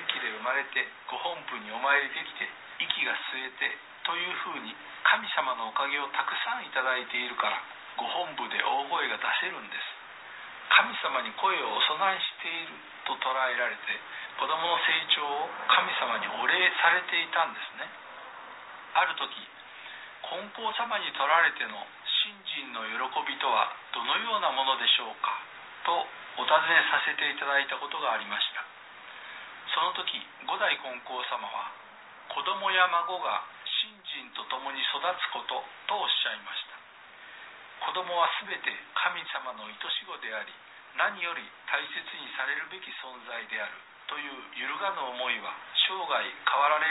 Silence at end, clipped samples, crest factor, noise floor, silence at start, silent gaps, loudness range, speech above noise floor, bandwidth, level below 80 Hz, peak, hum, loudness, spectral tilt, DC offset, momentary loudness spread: 0 s; under 0.1%; 26 dB; -51 dBFS; 0 s; none; 6 LU; 21 dB; 4.1 kHz; -84 dBFS; -6 dBFS; none; -29 LUFS; -3.5 dB/octave; under 0.1%; 16 LU